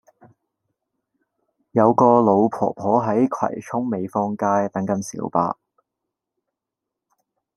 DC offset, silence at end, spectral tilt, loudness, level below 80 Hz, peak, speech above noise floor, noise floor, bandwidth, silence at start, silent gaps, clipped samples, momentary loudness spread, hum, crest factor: under 0.1%; 2.05 s; -8 dB/octave; -20 LUFS; -66 dBFS; -2 dBFS; 65 dB; -84 dBFS; 12 kHz; 1.75 s; none; under 0.1%; 11 LU; none; 20 dB